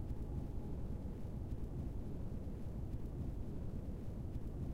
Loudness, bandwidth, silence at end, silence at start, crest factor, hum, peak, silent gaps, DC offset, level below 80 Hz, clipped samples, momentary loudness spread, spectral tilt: -46 LUFS; 15.5 kHz; 0 s; 0 s; 10 dB; none; -32 dBFS; none; under 0.1%; -46 dBFS; under 0.1%; 2 LU; -9.5 dB/octave